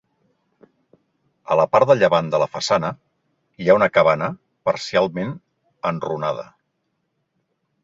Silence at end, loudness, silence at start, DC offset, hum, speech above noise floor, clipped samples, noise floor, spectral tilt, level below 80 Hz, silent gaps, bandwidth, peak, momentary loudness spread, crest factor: 1.4 s; -19 LUFS; 1.5 s; under 0.1%; none; 54 dB; under 0.1%; -73 dBFS; -5.5 dB/octave; -60 dBFS; none; 7.8 kHz; -2 dBFS; 14 LU; 20 dB